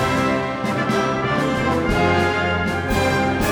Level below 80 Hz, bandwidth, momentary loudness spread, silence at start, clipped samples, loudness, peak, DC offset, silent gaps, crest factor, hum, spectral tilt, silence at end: -36 dBFS; over 20 kHz; 4 LU; 0 s; under 0.1%; -19 LUFS; -4 dBFS; under 0.1%; none; 16 dB; none; -5.5 dB/octave; 0 s